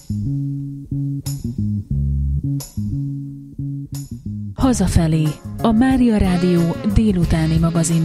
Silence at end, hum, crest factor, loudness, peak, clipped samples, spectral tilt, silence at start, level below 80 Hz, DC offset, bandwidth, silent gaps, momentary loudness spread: 0 s; none; 18 dB; -19 LUFS; 0 dBFS; under 0.1%; -6.5 dB/octave; 0.1 s; -28 dBFS; under 0.1%; 15 kHz; none; 13 LU